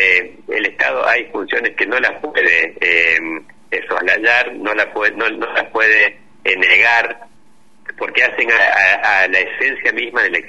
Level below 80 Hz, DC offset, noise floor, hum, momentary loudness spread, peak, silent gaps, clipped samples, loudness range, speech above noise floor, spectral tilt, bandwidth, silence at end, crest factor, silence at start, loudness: -58 dBFS; 0.8%; -53 dBFS; none; 11 LU; 0 dBFS; none; under 0.1%; 2 LU; 38 dB; -2.5 dB/octave; 11 kHz; 0 s; 16 dB; 0 s; -14 LUFS